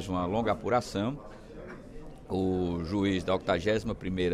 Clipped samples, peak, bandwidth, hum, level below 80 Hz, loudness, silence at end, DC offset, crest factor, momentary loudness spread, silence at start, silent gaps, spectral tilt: under 0.1%; -14 dBFS; 13 kHz; none; -48 dBFS; -30 LUFS; 0 s; under 0.1%; 16 dB; 18 LU; 0 s; none; -6.5 dB/octave